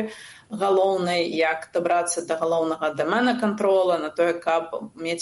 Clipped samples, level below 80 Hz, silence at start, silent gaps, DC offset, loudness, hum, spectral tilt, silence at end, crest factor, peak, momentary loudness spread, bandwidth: under 0.1%; -70 dBFS; 0 s; none; under 0.1%; -23 LUFS; none; -4 dB/octave; 0 s; 16 dB; -8 dBFS; 9 LU; 11.5 kHz